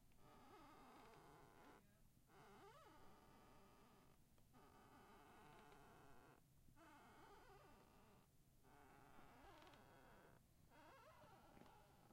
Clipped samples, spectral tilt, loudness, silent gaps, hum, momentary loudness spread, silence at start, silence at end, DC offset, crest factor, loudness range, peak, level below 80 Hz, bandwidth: under 0.1%; -4.5 dB/octave; -68 LUFS; none; none; 3 LU; 0 s; 0 s; under 0.1%; 18 dB; 1 LU; -52 dBFS; -78 dBFS; 16 kHz